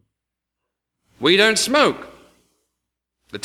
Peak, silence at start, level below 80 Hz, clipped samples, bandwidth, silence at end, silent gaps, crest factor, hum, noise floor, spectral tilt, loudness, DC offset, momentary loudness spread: -2 dBFS; 1.2 s; -60 dBFS; under 0.1%; 16.5 kHz; 0.05 s; none; 20 dB; none; -83 dBFS; -2.5 dB/octave; -16 LUFS; under 0.1%; 19 LU